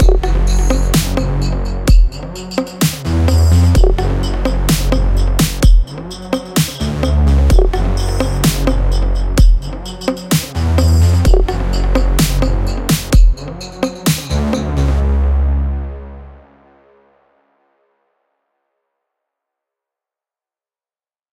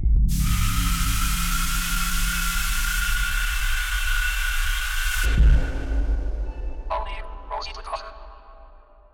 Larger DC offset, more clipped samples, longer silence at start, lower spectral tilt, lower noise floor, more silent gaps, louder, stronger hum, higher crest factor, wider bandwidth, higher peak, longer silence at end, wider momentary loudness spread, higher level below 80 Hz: neither; neither; about the same, 0 s vs 0 s; first, -5.5 dB/octave vs -3 dB/octave; first, under -90 dBFS vs -48 dBFS; neither; first, -15 LUFS vs -25 LUFS; neither; about the same, 14 dB vs 12 dB; about the same, 16.5 kHz vs 18 kHz; first, 0 dBFS vs -10 dBFS; first, 4.95 s vs 0.35 s; about the same, 10 LU vs 11 LU; first, -16 dBFS vs -24 dBFS